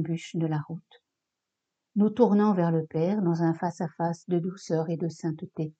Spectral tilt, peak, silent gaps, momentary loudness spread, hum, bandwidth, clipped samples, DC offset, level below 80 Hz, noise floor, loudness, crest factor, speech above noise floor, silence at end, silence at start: -8 dB/octave; -6 dBFS; none; 12 LU; none; 8.2 kHz; under 0.1%; under 0.1%; -78 dBFS; -85 dBFS; -27 LUFS; 20 dB; 59 dB; 0.1 s; 0 s